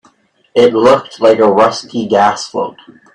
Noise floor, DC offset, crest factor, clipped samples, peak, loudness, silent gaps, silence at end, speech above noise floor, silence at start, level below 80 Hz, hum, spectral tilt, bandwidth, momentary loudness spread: -51 dBFS; under 0.1%; 12 dB; under 0.1%; 0 dBFS; -11 LUFS; none; 0.45 s; 40 dB; 0.55 s; -54 dBFS; none; -5 dB/octave; 10.5 kHz; 11 LU